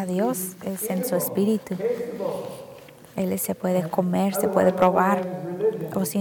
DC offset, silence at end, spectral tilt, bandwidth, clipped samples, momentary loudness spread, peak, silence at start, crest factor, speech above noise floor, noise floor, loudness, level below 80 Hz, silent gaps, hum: under 0.1%; 0 s; -6 dB/octave; 19 kHz; under 0.1%; 11 LU; -6 dBFS; 0 s; 18 dB; 21 dB; -45 dBFS; -24 LUFS; -64 dBFS; none; none